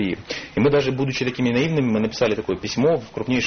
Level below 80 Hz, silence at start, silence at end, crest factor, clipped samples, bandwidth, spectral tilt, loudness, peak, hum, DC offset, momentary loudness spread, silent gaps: -48 dBFS; 0 s; 0 s; 14 dB; under 0.1%; 6.6 kHz; -5 dB/octave; -21 LUFS; -8 dBFS; none; under 0.1%; 6 LU; none